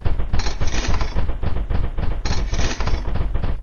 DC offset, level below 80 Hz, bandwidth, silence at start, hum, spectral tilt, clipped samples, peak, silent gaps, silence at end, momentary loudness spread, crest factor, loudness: under 0.1%; -22 dBFS; 7 kHz; 0 s; none; -5 dB/octave; under 0.1%; -4 dBFS; none; 0 s; 3 LU; 14 dB; -25 LUFS